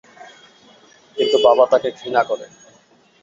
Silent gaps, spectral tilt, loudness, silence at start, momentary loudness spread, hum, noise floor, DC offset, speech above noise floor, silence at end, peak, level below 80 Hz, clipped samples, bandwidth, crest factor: none; -3.5 dB/octave; -17 LUFS; 1.15 s; 13 LU; none; -54 dBFS; under 0.1%; 37 dB; 0.8 s; -2 dBFS; -64 dBFS; under 0.1%; 7.6 kHz; 18 dB